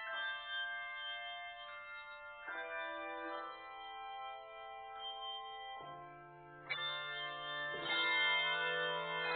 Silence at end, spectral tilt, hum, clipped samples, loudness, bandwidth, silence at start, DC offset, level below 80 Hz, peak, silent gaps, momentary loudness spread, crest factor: 0 s; 1.5 dB/octave; none; under 0.1%; -40 LUFS; 4.6 kHz; 0 s; under 0.1%; -78 dBFS; -24 dBFS; none; 16 LU; 18 dB